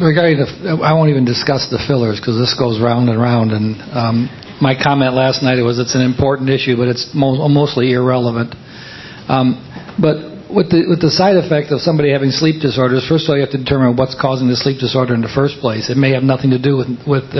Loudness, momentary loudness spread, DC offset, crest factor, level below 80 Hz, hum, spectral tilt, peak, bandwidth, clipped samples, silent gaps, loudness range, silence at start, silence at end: -14 LUFS; 6 LU; under 0.1%; 14 dB; -42 dBFS; none; -6.5 dB/octave; 0 dBFS; 6.2 kHz; under 0.1%; none; 2 LU; 0 s; 0 s